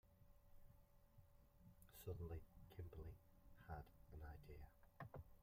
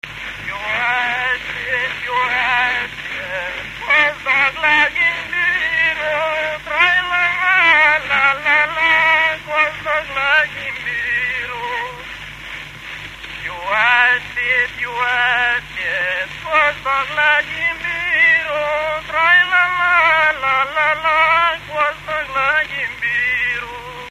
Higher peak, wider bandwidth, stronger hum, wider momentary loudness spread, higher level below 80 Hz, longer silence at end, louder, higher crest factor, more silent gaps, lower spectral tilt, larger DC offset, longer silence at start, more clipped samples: second, -40 dBFS vs 0 dBFS; about the same, 16 kHz vs 15 kHz; neither; about the same, 11 LU vs 13 LU; second, -66 dBFS vs -46 dBFS; about the same, 0 s vs 0 s; second, -60 LUFS vs -15 LUFS; about the same, 20 dB vs 18 dB; neither; first, -7 dB/octave vs -2.5 dB/octave; neither; about the same, 0.05 s vs 0.05 s; neither